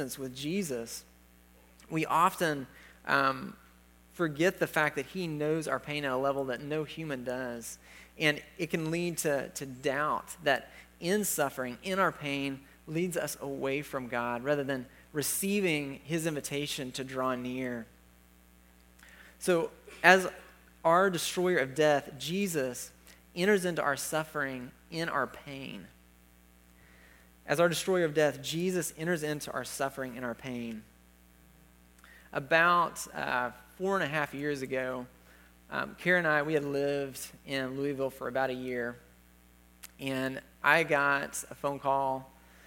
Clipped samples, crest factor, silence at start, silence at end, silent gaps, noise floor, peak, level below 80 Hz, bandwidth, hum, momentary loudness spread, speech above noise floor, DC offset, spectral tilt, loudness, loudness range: under 0.1%; 28 dB; 0 s; 0.4 s; none; -60 dBFS; -4 dBFS; -64 dBFS; 17 kHz; 60 Hz at -60 dBFS; 13 LU; 29 dB; under 0.1%; -4 dB/octave; -31 LUFS; 7 LU